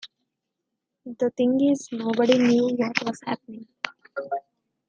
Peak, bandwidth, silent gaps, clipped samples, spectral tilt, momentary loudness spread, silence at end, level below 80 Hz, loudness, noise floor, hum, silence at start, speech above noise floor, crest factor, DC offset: -2 dBFS; 9 kHz; none; under 0.1%; -5 dB/octave; 15 LU; 0.5 s; -74 dBFS; -24 LUFS; -82 dBFS; none; 0.05 s; 59 dB; 22 dB; under 0.1%